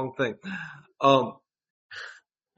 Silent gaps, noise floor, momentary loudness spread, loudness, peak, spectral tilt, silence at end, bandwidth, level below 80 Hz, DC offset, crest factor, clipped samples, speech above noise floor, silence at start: 1.70-1.89 s; -53 dBFS; 21 LU; -26 LUFS; -6 dBFS; -3.5 dB/octave; 0.45 s; 8 kHz; -70 dBFS; under 0.1%; 24 dB; under 0.1%; 27 dB; 0 s